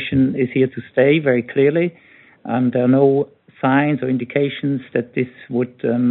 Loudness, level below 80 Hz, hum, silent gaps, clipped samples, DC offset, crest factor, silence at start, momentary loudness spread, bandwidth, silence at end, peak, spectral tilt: -18 LUFS; -58 dBFS; none; none; under 0.1%; under 0.1%; 16 dB; 0 s; 9 LU; 4.1 kHz; 0 s; -2 dBFS; -6.5 dB/octave